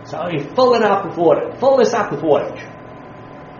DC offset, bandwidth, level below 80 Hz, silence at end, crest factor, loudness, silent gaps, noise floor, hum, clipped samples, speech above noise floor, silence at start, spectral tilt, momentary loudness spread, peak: under 0.1%; 7.2 kHz; -54 dBFS; 0 s; 16 dB; -16 LUFS; none; -36 dBFS; none; under 0.1%; 20 dB; 0 s; -4.5 dB/octave; 23 LU; -2 dBFS